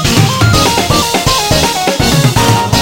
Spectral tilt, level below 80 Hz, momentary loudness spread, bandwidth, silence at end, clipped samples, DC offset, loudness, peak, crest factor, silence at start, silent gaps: -4 dB/octave; -24 dBFS; 2 LU; 17 kHz; 0 s; 0.2%; under 0.1%; -9 LUFS; 0 dBFS; 10 dB; 0 s; none